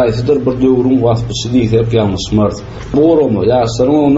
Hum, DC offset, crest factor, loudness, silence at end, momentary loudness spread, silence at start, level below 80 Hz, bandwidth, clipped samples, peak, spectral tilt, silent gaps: none; under 0.1%; 12 dB; -12 LUFS; 0 s; 5 LU; 0 s; -32 dBFS; 8 kHz; under 0.1%; 0 dBFS; -7 dB/octave; none